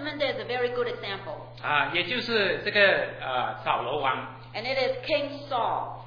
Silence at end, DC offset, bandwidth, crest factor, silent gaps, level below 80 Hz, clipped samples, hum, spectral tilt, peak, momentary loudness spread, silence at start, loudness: 0 s; under 0.1%; 5.4 kHz; 20 dB; none; -58 dBFS; under 0.1%; none; -5.5 dB/octave; -6 dBFS; 12 LU; 0 s; -27 LUFS